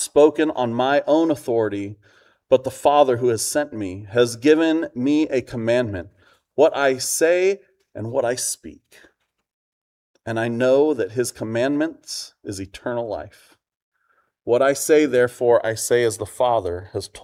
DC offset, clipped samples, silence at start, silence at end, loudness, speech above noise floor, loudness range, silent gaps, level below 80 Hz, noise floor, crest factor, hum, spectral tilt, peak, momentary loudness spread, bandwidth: under 0.1%; under 0.1%; 0 s; 0.05 s; -20 LUFS; 46 dB; 6 LU; 9.53-10.14 s, 13.76-13.92 s; -58 dBFS; -66 dBFS; 18 dB; none; -4.5 dB/octave; -2 dBFS; 14 LU; 16 kHz